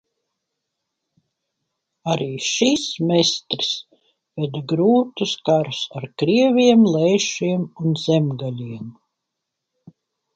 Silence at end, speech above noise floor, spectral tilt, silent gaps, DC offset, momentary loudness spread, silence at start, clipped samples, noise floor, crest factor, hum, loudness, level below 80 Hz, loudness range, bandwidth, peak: 1.45 s; 62 dB; -5 dB/octave; none; under 0.1%; 14 LU; 2.05 s; under 0.1%; -80 dBFS; 20 dB; none; -19 LUFS; -64 dBFS; 5 LU; 9 kHz; -2 dBFS